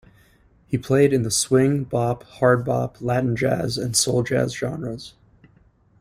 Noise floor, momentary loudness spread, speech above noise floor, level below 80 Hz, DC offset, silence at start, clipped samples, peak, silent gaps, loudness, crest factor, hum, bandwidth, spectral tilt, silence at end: -57 dBFS; 11 LU; 36 dB; -52 dBFS; under 0.1%; 0.7 s; under 0.1%; -4 dBFS; none; -21 LUFS; 18 dB; none; 16 kHz; -5 dB/octave; 0.9 s